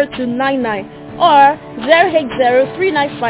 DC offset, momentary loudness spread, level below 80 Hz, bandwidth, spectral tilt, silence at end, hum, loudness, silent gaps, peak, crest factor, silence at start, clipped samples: under 0.1%; 12 LU; -50 dBFS; 4 kHz; -8.5 dB/octave; 0 s; none; -13 LUFS; none; 0 dBFS; 14 dB; 0 s; under 0.1%